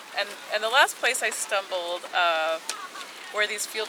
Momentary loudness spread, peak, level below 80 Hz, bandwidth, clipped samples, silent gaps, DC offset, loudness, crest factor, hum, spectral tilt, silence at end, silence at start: 13 LU; -6 dBFS; under -90 dBFS; over 20 kHz; under 0.1%; none; under 0.1%; -25 LUFS; 20 dB; none; 1.5 dB/octave; 0 s; 0 s